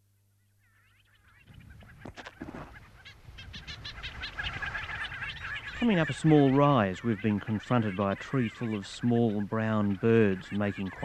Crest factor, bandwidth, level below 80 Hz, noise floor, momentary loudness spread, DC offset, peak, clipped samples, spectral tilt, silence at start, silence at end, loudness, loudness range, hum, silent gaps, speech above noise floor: 20 dB; 9.6 kHz; -54 dBFS; -68 dBFS; 22 LU; under 0.1%; -10 dBFS; under 0.1%; -7 dB/octave; 1.5 s; 0 s; -29 LUFS; 20 LU; 50 Hz at -60 dBFS; none; 41 dB